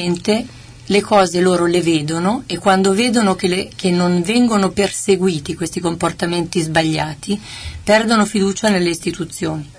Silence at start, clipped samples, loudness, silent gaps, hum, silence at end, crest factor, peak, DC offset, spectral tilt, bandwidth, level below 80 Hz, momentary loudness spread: 0 s; under 0.1%; -16 LUFS; none; none; 0.05 s; 14 dB; -2 dBFS; under 0.1%; -5 dB/octave; 11 kHz; -44 dBFS; 9 LU